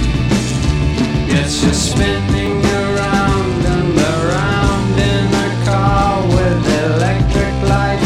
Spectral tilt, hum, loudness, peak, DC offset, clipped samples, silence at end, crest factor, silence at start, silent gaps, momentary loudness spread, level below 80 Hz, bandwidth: -5.5 dB/octave; none; -14 LUFS; 0 dBFS; under 0.1%; under 0.1%; 0 s; 14 dB; 0 s; none; 2 LU; -22 dBFS; 13.5 kHz